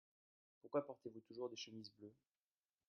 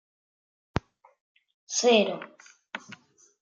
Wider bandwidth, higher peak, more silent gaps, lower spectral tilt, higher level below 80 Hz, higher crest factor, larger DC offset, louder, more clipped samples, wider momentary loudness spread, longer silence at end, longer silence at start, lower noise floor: second, 6.8 kHz vs 9.4 kHz; second, -30 dBFS vs -8 dBFS; neither; about the same, -4 dB/octave vs -3 dB/octave; second, under -90 dBFS vs -54 dBFS; about the same, 22 dB vs 24 dB; neither; second, -50 LUFS vs -26 LUFS; neither; second, 18 LU vs 22 LU; first, 0.75 s vs 0.5 s; second, 0.65 s vs 1.7 s; first, under -90 dBFS vs -53 dBFS